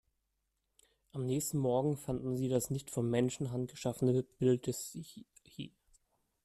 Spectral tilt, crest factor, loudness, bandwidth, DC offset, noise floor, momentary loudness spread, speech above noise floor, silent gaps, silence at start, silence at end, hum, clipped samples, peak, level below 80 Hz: -6.5 dB/octave; 18 dB; -35 LUFS; 14.5 kHz; under 0.1%; -83 dBFS; 16 LU; 49 dB; none; 1.15 s; 0.75 s; none; under 0.1%; -18 dBFS; -64 dBFS